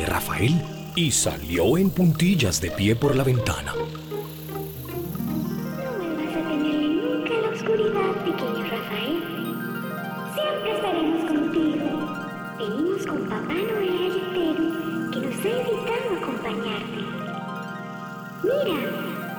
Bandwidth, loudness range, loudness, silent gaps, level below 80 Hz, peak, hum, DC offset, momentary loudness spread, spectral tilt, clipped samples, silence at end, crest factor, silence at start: over 20 kHz; 6 LU; -25 LUFS; none; -50 dBFS; -10 dBFS; none; under 0.1%; 11 LU; -5 dB/octave; under 0.1%; 0 s; 14 dB; 0 s